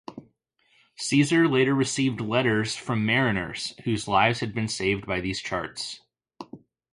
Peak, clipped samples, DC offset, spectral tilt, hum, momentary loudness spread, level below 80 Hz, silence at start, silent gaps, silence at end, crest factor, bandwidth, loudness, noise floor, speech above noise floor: -6 dBFS; under 0.1%; under 0.1%; -5 dB/octave; none; 16 LU; -54 dBFS; 0.1 s; none; 0.35 s; 20 dB; 11.5 kHz; -25 LUFS; -67 dBFS; 42 dB